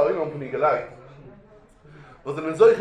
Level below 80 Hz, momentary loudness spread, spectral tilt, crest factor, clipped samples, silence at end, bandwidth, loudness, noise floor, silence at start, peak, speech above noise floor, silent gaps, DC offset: -58 dBFS; 22 LU; -6.5 dB/octave; 20 dB; under 0.1%; 0 s; 9.2 kHz; -23 LUFS; -51 dBFS; 0 s; -4 dBFS; 30 dB; none; under 0.1%